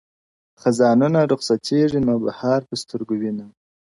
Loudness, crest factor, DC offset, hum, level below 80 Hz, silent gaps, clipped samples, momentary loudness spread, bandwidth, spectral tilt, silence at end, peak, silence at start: -20 LUFS; 16 dB; under 0.1%; none; -58 dBFS; none; under 0.1%; 12 LU; 11.5 kHz; -6.5 dB/octave; 0.5 s; -6 dBFS; 0.65 s